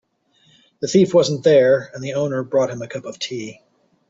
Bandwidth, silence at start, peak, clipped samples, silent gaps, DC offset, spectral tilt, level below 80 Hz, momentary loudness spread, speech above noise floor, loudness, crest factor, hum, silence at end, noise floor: 7.8 kHz; 0.8 s; -2 dBFS; under 0.1%; none; under 0.1%; -5.5 dB/octave; -62 dBFS; 15 LU; 41 dB; -18 LUFS; 16 dB; none; 0.55 s; -59 dBFS